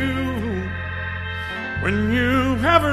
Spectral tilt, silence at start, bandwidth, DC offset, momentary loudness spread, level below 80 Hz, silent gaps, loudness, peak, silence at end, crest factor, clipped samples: -6.5 dB/octave; 0 s; 14 kHz; under 0.1%; 10 LU; -38 dBFS; none; -22 LUFS; 0 dBFS; 0 s; 20 dB; under 0.1%